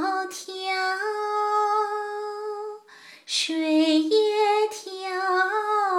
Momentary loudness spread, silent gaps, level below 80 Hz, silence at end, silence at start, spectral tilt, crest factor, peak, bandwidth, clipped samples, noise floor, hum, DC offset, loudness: 13 LU; none; -88 dBFS; 0 s; 0 s; -0.5 dB/octave; 14 dB; -10 dBFS; 14 kHz; under 0.1%; -49 dBFS; none; under 0.1%; -24 LUFS